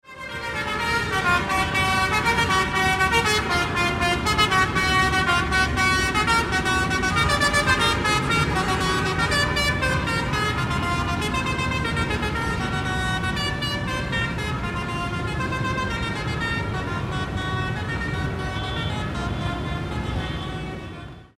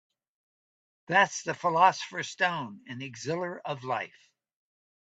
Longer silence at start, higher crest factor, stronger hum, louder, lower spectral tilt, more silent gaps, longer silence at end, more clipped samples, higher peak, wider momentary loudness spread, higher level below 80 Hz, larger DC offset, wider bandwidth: second, 0.05 s vs 1.1 s; about the same, 18 dB vs 22 dB; neither; first, -22 LUFS vs -28 LUFS; about the same, -4 dB/octave vs -3.5 dB/octave; neither; second, 0.1 s vs 1 s; neither; about the same, -6 dBFS vs -8 dBFS; second, 8 LU vs 16 LU; first, -34 dBFS vs -78 dBFS; neither; first, 16 kHz vs 9 kHz